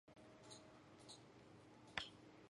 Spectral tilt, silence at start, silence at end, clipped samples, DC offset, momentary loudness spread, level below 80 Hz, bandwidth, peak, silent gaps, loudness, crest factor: -3 dB/octave; 0.05 s; 0.05 s; under 0.1%; under 0.1%; 15 LU; -80 dBFS; 11.5 kHz; -24 dBFS; none; -57 LUFS; 34 dB